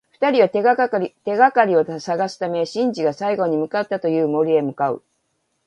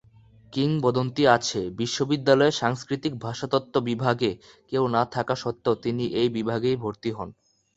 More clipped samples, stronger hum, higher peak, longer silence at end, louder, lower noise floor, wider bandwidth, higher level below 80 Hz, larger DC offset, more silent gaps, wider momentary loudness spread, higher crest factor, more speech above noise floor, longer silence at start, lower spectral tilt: neither; neither; first, 0 dBFS vs -4 dBFS; first, 0.7 s vs 0.45 s; first, -19 LUFS vs -25 LUFS; first, -70 dBFS vs -54 dBFS; first, 9.2 kHz vs 8.2 kHz; second, -70 dBFS vs -58 dBFS; neither; neither; about the same, 8 LU vs 10 LU; about the same, 18 dB vs 22 dB; first, 51 dB vs 29 dB; second, 0.2 s vs 0.5 s; about the same, -6 dB/octave vs -5.5 dB/octave